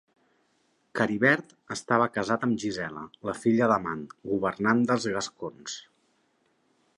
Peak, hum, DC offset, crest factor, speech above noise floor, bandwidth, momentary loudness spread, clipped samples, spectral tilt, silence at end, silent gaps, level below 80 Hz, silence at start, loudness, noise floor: -8 dBFS; none; under 0.1%; 20 dB; 43 dB; 11.5 kHz; 14 LU; under 0.1%; -5 dB/octave; 1.15 s; none; -64 dBFS; 0.95 s; -27 LUFS; -70 dBFS